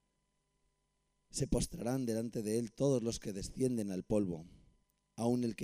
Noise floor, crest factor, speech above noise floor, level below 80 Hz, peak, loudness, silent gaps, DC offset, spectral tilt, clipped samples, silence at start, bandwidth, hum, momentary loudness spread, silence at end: -81 dBFS; 18 dB; 45 dB; -52 dBFS; -20 dBFS; -37 LUFS; none; under 0.1%; -6 dB/octave; under 0.1%; 1.35 s; 15.5 kHz; 50 Hz at -65 dBFS; 8 LU; 0 s